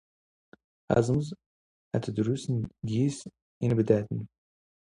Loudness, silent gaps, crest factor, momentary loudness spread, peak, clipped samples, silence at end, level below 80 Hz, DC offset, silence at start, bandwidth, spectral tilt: -29 LUFS; 1.46-1.91 s, 3.42-3.61 s; 22 dB; 15 LU; -8 dBFS; under 0.1%; 0.7 s; -58 dBFS; under 0.1%; 0.9 s; 11 kHz; -7.5 dB/octave